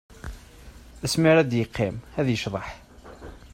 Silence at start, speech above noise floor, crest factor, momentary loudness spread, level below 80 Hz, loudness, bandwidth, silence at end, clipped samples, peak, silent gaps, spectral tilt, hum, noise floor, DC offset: 0.1 s; 23 dB; 20 dB; 25 LU; -46 dBFS; -24 LUFS; 16 kHz; 0.15 s; under 0.1%; -6 dBFS; none; -5.5 dB/octave; none; -46 dBFS; under 0.1%